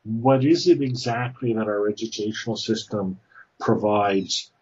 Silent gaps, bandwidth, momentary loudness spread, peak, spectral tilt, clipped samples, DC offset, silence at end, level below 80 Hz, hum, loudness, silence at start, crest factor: none; 8 kHz; 10 LU; -6 dBFS; -5.5 dB/octave; under 0.1%; under 0.1%; 0.15 s; -66 dBFS; none; -23 LUFS; 0.05 s; 16 dB